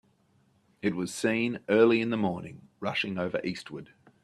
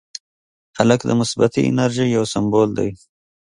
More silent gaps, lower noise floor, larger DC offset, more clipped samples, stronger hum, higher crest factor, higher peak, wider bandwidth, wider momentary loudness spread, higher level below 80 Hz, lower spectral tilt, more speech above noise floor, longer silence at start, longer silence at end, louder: neither; second, -67 dBFS vs under -90 dBFS; neither; neither; neither; about the same, 20 dB vs 18 dB; second, -8 dBFS vs 0 dBFS; first, 13 kHz vs 11.5 kHz; first, 17 LU vs 9 LU; second, -70 dBFS vs -52 dBFS; about the same, -5.5 dB/octave vs -6 dB/octave; second, 38 dB vs over 73 dB; about the same, 0.85 s vs 0.75 s; second, 0.4 s vs 0.65 s; second, -28 LUFS vs -18 LUFS